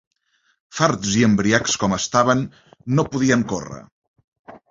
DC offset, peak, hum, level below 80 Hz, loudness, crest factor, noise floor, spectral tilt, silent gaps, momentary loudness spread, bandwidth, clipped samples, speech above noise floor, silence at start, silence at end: under 0.1%; -2 dBFS; none; -50 dBFS; -19 LUFS; 20 dB; -66 dBFS; -4.5 dB/octave; 3.92-4.02 s, 4.08-4.14 s, 4.24-4.32 s, 4.39-4.45 s; 17 LU; 7.8 kHz; under 0.1%; 47 dB; 0.75 s; 0.15 s